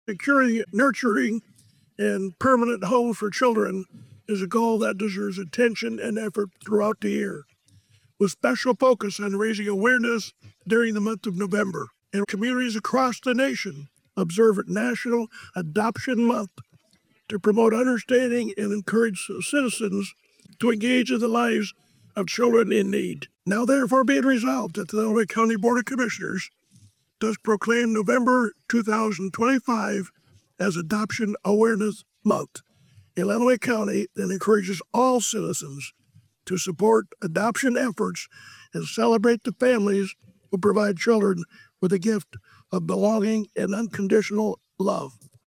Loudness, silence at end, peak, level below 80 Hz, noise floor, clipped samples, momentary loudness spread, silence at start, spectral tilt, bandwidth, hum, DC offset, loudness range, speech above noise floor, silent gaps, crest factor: -24 LUFS; 0.35 s; -8 dBFS; -72 dBFS; -64 dBFS; under 0.1%; 11 LU; 0.1 s; -5 dB/octave; 16 kHz; none; under 0.1%; 3 LU; 41 dB; none; 14 dB